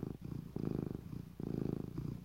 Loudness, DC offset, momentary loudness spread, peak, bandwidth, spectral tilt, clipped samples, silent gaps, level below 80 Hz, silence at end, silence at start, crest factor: -43 LUFS; under 0.1%; 6 LU; -24 dBFS; 16 kHz; -9.5 dB/octave; under 0.1%; none; -56 dBFS; 0 s; 0 s; 18 dB